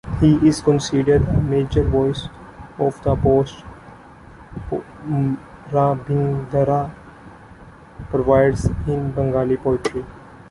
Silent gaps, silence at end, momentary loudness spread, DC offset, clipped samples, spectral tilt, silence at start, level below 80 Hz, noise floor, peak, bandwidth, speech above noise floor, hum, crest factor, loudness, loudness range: none; 0.15 s; 17 LU; under 0.1%; under 0.1%; -7.5 dB/octave; 0.05 s; -34 dBFS; -43 dBFS; -2 dBFS; 11.5 kHz; 24 dB; none; 18 dB; -19 LUFS; 5 LU